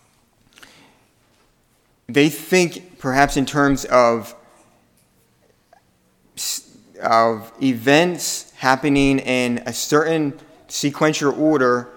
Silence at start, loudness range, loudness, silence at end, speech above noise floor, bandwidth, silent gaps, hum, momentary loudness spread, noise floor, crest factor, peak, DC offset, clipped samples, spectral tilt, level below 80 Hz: 2.1 s; 5 LU; -18 LUFS; 0.05 s; 43 dB; 19 kHz; none; none; 10 LU; -61 dBFS; 20 dB; 0 dBFS; under 0.1%; under 0.1%; -4.5 dB/octave; -44 dBFS